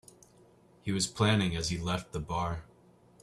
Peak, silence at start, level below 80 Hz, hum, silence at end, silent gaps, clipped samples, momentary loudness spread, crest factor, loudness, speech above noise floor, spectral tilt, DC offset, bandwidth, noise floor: -12 dBFS; 0.85 s; -52 dBFS; none; 0.6 s; none; under 0.1%; 10 LU; 20 dB; -32 LUFS; 30 dB; -4.5 dB/octave; under 0.1%; 13.5 kHz; -61 dBFS